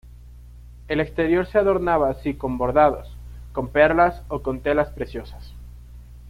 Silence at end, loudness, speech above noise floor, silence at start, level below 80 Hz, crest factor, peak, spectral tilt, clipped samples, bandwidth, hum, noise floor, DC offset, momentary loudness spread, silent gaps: 0 s; -21 LUFS; 22 dB; 0.05 s; -38 dBFS; 20 dB; -4 dBFS; -8 dB/octave; under 0.1%; 14 kHz; 60 Hz at -40 dBFS; -42 dBFS; under 0.1%; 19 LU; none